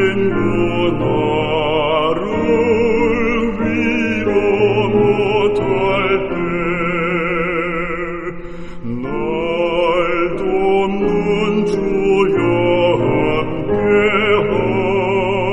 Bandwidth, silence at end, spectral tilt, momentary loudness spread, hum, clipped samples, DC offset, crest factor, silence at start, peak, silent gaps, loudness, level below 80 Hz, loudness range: 8.4 kHz; 0 s; -7 dB/octave; 6 LU; none; under 0.1%; under 0.1%; 12 dB; 0 s; -2 dBFS; none; -16 LUFS; -34 dBFS; 4 LU